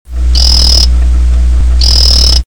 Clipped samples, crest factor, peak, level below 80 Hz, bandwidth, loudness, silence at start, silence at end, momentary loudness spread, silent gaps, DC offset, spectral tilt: 1%; 8 dB; 0 dBFS; -8 dBFS; 18 kHz; -7 LUFS; 0.05 s; 0 s; 5 LU; none; 10%; -3 dB/octave